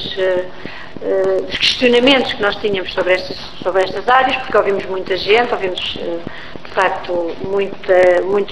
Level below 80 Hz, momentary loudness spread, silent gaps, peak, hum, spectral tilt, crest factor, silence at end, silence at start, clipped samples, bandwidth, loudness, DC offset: -44 dBFS; 13 LU; none; 0 dBFS; none; -4 dB/octave; 16 dB; 0 s; 0 s; under 0.1%; 11 kHz; -16 LUFS; 3%